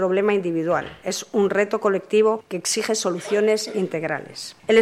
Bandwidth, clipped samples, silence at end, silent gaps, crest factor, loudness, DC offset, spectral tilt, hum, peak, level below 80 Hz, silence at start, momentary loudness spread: 15 kHz; under 0.1%; 0 s; none; 16 dB; -22 LUFS; under 0.1%; -4 dB/octave; none; -4 dBFS; -64 dBFS; 0 s; 9 LU